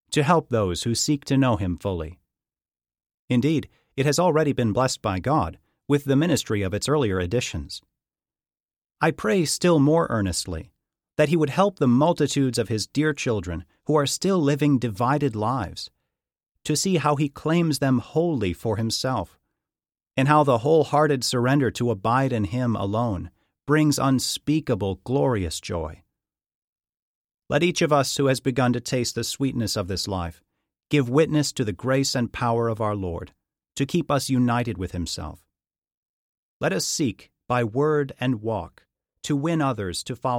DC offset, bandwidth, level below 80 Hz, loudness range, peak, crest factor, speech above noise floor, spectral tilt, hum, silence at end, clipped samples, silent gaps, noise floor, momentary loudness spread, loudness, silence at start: under 0.1%; 16.5 kHz; -50 dBFS; 4 LU; -4 dBFS; 20 dB; over 67 dB; -5.5 dB/octave; none; 0 s; under 0.1%; 3.14-3.28 s, 8.78-8.82 s, 26.55-26.76 s, 26.89-26.93 s, 26.99-27.29 s, 35.78-35.82 s, 35.97-36.60 s; under -90 dBFS; 11 LU; -23 LUFS; 0.1 s